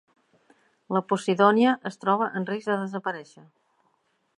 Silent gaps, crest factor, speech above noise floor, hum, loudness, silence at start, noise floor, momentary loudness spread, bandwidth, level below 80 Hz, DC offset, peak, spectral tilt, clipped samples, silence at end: none; 22 dB; 46 dB; none; -25 LUFS; 0.9 s; -70 dBFS; 12 LU; 11 kHz; -80 dBFS; under 0.1%; -4 dBFS; -6 dB/octave; under 0.1%; 1.15 s